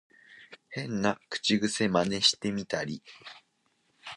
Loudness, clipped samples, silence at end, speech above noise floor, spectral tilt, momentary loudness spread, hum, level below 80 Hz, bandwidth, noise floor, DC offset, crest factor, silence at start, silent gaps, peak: -28 LUFS; under 0.1%; 0 s; 43 dB; -3.5 dB/octave; 23 LU; none; -64 dBFS; 11.5 kHz; -73 dBFS; under 0.1%; 22 dB; 0.3 s; none; -10 dBFS